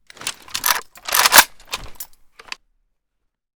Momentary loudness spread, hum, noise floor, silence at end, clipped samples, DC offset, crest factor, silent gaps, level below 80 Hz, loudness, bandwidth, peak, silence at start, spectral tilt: 25 LU; none; -73 dBFS; 1.55 s; 0.2%; under 0.1%; 22 dB; none; -50 dBFS; -15 LUFS; over 20 kHz; 0 dBFS; 0.2 s; 1.5 dB/octave